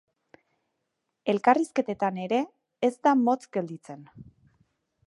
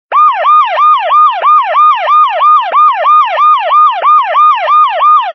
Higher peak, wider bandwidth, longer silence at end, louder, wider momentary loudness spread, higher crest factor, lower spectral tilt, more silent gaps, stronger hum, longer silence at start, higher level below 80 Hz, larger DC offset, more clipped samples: second, -6 dBFS vs 0 dBFS; first, 11.5 kHz vs 6 kHz; first, 0.85 s vs 0 s; second, -26 LUFS vs -6 LUFS; first, 16 LU vs 2 LU; first, 22 dB vs 6 dB; first, -6 dB/octave vs 6.5 dB/octave; neither; neither; first, 1.25 s vs 0.1 s; first, -72 dBFS vs -86 dBFS; neither; neither